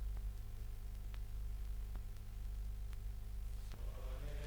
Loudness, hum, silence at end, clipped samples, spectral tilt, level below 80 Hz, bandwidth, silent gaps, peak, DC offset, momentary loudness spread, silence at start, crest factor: -50 LUFS; 50 Hz at -50 dBFS; 0 s; under 0.1%; -6 dB/octave; -44 dBFS; over 20 kHz; none; -32 dBFS; under 0.1%; 3 LU; 0 s; 12 dB